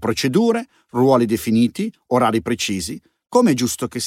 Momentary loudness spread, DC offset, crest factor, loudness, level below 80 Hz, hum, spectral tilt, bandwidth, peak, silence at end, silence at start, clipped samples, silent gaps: 11 LU; under 0.1%; 16 dB; -19 LUFS; -52 dBFS; none; -5 dB/octave; 16.5 kHz; -2 dBFS; 0 s; 0 s; under 0.1%; none